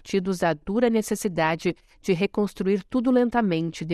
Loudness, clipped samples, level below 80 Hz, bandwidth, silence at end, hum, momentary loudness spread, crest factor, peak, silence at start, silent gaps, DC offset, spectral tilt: -24 LUFS; under 0.1%; -52 dBFS; 14 kHz; 0 s; none; 6 LU; 16 dB; -8 dBFS; 0.05 s; none; under 0.1%; -6 dB/octave